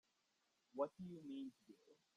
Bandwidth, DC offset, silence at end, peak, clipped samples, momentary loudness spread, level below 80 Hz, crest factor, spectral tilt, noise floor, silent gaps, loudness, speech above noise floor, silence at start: 11 kHz; under 0.1%; 0.2 s; -30 dBFS; under 0.1%; 22 LU; -90 dBFS; 22 dB; -8 dB/octave; -85 dBFS; none; -50 LUFS; 34 dB; 0.75 s